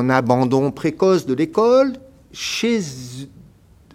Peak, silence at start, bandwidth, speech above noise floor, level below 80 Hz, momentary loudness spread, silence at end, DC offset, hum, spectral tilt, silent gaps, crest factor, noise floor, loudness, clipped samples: 0 dBFS; 0 s; 15.5 kHz; 31 dB; -54 dBFS; 20 LU; 0.7 s; under 0.1%; none; -5.5 dB/octave; none; 18 dB; -49 dBFS; -18 LUFS; under 0.1%